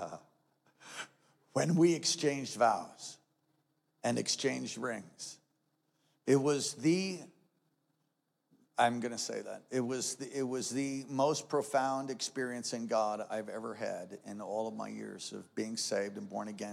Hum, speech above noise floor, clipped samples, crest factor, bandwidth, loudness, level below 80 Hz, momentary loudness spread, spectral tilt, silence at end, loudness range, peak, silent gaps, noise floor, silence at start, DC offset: none; 47 dB; under 0.1%; 22 dB; 15 kHz; -34 LUFS; under -90 dBFS; 15 LU; -4 dB/octave; 0 s; 5 LU; -14 dBFS; none; -81 dBFS; 0 s; under 0.1%